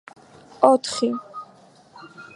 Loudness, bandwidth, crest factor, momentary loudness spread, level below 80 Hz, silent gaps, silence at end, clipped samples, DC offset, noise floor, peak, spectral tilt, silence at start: -21 LUFS; 11.5 kHz; 24 dB; 22 LU; -68 dBFS; none; 0.15 s; under 0.1%; under 0.1%; -51 dBFS; 0 dBFS; -3.5 dB/octave; 0.6 s